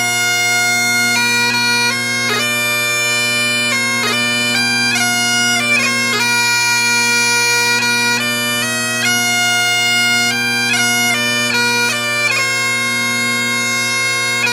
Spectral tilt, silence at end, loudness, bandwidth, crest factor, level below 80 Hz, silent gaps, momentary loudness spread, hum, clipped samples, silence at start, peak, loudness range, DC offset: -1 dB/octave; 0 s; -13 LUFS; 16.5 kHz; 14 dB; -60 dBFS; none; 3 LU; none; under 0.1%; 0 s; -2 dBFS; 2 LU; under 0.1%